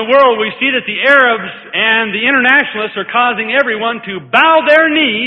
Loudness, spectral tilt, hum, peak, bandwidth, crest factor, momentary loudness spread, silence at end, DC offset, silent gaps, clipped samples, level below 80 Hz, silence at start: -11 LUFS; -5 dB/octave; none; 0 dBFS; 8 kHz; 12 dB; 9 LU; 0 s; under 0.1%; none; 0.1%; -60 dBFS; 0 s